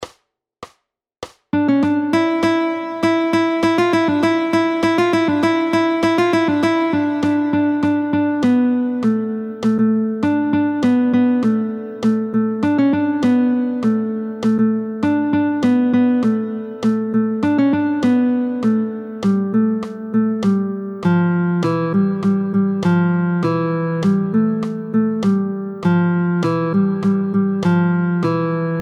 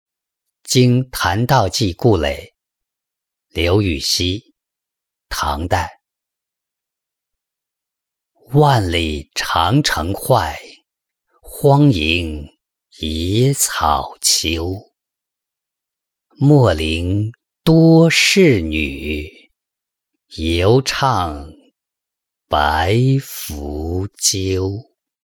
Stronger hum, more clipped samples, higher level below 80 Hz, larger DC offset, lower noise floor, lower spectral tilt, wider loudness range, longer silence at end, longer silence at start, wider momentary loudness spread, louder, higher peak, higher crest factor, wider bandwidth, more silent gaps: neither; neither; second, -58 dBFS vs -38 dBFS; neither; second, -68 dBFS vs -83 dBFS; first, -7.5 dB/octave vs -4.5 dB/octave; second, 2 LU vs 7 LU; second, 0 s vs 0.45 s; second, 0 s vs 0.65 s; second, 5 LU vs 14 LU; about the same, -17 LUFS vs -16 LUFS; about the same, -4 dBFS vs -2 dBFS; about the same, 12 dB vs 16 dB; second, 11 kHz vs 19.5 kHz; neither